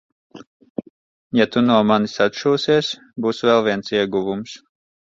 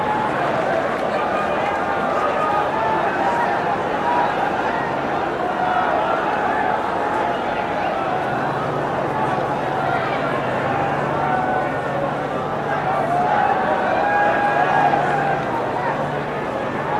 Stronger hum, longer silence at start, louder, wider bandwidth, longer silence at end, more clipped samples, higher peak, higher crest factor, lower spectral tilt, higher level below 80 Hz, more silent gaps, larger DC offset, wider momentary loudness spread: neither; first, 0.35 s vs 0 s; about the same, -19 LUFS vs -20 LUFS; second, 7.6 kHz vs 13.5 kHz; first, 0.5 s vs 0 s; neither; about the same, -2 dBFS vs -4 dBFS; about the same, 18 dB vs 14 dB; about the same, -5.5 dB/octave vs -6 dB/octave; second, -60 dBFS vs -50 dBFS; first, 0.47-0.60 s, 0.70-0.75 s, 0.90-1.30 s vs none; neither; first, 18 LU vs 5 LU